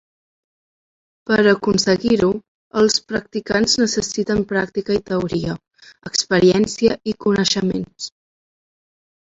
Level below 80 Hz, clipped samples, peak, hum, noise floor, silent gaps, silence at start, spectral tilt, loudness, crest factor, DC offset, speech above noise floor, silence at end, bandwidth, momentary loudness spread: -48 dBFS; under 0.1%; -2 dBFS; none; under -90 dBFS; 2.48-2.71 s; 1.25 s; -4 dB/octave; -18 LUFS; 18 dB; under 0.1%; over 72 dB; 1.3 s; 8.2 kHz; 13 LU